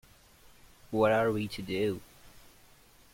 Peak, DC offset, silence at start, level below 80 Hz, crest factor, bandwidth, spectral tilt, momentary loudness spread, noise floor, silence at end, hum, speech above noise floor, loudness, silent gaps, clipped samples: -14 dBFS; under 0.1%; 0.9 s; -60 dBFS; 20 dB; 16.5 kHz; -6 dB/octave; 10 LU; -59 dBFS; 0.75 s; none; 30 dB; -30 LUFS; none; under 0.1%